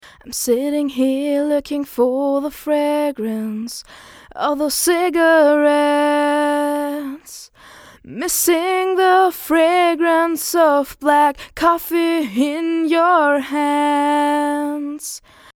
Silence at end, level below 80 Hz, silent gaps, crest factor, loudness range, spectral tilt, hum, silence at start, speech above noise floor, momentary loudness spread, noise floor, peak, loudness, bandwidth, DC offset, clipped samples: 0.35 s; -54 dBFS; none; 16 dB; 4 LU; -2.5 dB/octave; none; 0.25 s; 27 dB; 13 LU; -43 dBFS; 0 dBFS; -17 LUFS; over 20 kHz; under 0.1%; under 0.1%